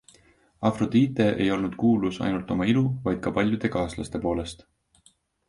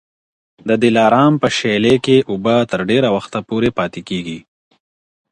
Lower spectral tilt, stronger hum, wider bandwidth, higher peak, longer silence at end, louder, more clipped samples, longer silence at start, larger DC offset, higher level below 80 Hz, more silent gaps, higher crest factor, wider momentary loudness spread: about the same, -7 dB/octave vs -6 dB/octave; neither; about the same, 11.5 kHz vs 10.5 kHz; second, -8 dBFS vs 0 dBFS; about the same, 0.95 s vs 0.9 s; second, -25 LUFS vs -15 LUFS; neither; about the same, 0.6 s vs 0.65 s; neither; about the same, -48 dBFS vs -52 dBFS; neither; about the same, 18 dB vs 16 dB; second, 7 LU vs 12 LU